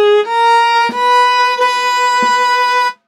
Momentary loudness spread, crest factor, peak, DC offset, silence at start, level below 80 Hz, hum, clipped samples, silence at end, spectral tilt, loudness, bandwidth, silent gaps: 3 LU; 8 dB; -2 dBFS; under 0.1%; 0 s; -72 dBFS; none; under 0.1%; 0.15 s; -0.5 dB/octave; -11 LUFS; 13.5 kHz; none